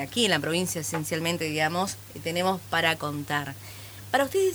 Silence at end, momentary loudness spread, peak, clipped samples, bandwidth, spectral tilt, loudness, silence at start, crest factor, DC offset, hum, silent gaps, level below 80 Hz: 0 s; 11 LU; -8 dBFS; under 0.1%; over 20 kHz; -3.5 dB/octave; -27 LUFS; 0 s; 20 dB; under 0.1%; none; none; -60 dBFS